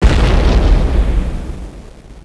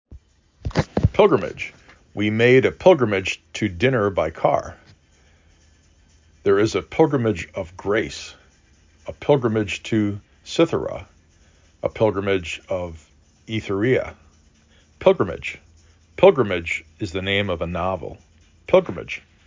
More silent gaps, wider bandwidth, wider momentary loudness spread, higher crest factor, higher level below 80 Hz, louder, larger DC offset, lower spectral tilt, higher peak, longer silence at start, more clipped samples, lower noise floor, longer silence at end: neither; first, 11 kHz vs 7.6 kHz; about the same, 17 LU vs 17 LU; second, 12 dB vs 20 dB; first, -14 dBFS vs -42 dBFS; first, -15 LUFS vs -21 LUFS; neither; about the same, -6.5 dB/octave vs -6 dB/octave; about the same, 0 dBFS vs -2 dBFS; about the same, 0 s vs 0.1 s; neither; second, -34 dBFS vs -56 dBFS; second, 0.05 s vs 0.25 s